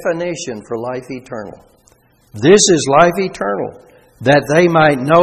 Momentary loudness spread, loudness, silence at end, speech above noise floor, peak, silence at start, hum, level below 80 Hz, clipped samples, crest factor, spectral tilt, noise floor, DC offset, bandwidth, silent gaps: 18 LU; -13 LUFS; 0 s; 39 dB; 0 dBFS; 0 s; none; -50 dBFS; under 0.1%; 14 dB; -4.5 dB/octave; -52 dBFS; under 0.1%; 13.5 kHz; none